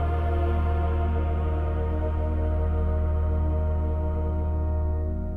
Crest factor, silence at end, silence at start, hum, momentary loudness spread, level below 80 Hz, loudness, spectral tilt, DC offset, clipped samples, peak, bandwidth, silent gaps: 10 dB; 0 s; 0 s; none; 2 LU; -26 dBFS; -27 LUFS; -10.5 dB/octave; 0.9%; under 0.1%; -14 dBFS; 3.4 kHz; none